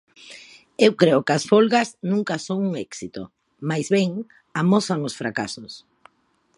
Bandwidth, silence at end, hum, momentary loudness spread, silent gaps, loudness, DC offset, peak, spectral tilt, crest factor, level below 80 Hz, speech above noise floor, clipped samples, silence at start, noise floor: 11.5 kHz; 0.8 s; none; 23 LU; none; -21 LUFS; under 0.1%; -2 dBFS; -5.5 dB/octave; 20 dB; -66 dBFS; 44 dB; under 0.1%; 0.25 s; -65 dBFS